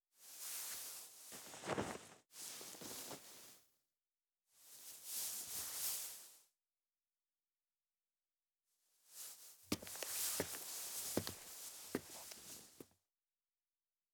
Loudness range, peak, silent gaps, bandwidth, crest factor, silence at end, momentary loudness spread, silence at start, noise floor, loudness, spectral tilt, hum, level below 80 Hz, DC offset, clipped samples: 9 LU; -22 dBFS; none; over 20 kHz; 28 dB; 1.25 s; 17 LU; 0.15 s; under -90 dBFS; -46 LUFS; -2 dB/octave; none; -78 dBFS; under 0.1%; under 0.1%